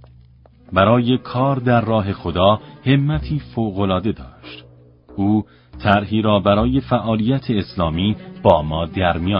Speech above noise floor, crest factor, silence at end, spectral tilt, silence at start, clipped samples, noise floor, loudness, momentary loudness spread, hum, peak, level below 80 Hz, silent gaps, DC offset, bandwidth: 30 dB; 18 dB; 0 s; -10 dB/octave; 0.7 s; under 0.1%; -48 dBFS; -18 LUFS; 8 LU; none; 0 dBFS; -36 dBFS; none; under 0.1%; 5.4 kHz